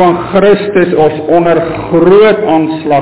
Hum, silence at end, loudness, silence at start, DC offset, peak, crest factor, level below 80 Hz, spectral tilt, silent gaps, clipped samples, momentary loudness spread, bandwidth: none; 0 s; -8 LUFS; 0 s; 1%; 0 dBFS; 8 dB; -40 dBFS; -11 dB/octave; none; 1%; 6 LU; 4 kHz